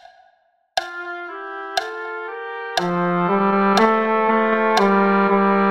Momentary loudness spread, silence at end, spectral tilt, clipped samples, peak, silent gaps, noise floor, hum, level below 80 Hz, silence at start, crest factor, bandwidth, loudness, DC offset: 14 LU; 0 s; -6 dB/octave; under 0.1%; -4 dBFS; none; -61 dBFS; none; -60 dBFS; 0.75 s; 16 dB; 14.5 kHz; -19 LUFS; under 0.1%